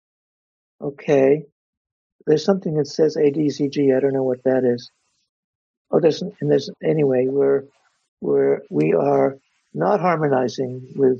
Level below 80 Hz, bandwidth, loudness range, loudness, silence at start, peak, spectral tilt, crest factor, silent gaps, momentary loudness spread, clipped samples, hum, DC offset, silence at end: -68 dBFS; 7.2 kHz; 2 LU; -20 LUFS; 0.8 s; -2 dBFS; -7 dB/octave; 18 dB; 1.52-1.85 s, 1.92-2.19 s, 5.29-5.85 s, 8.08-8.17 s; 9 LU; under 0.1%; none; under 0.1%; 0 s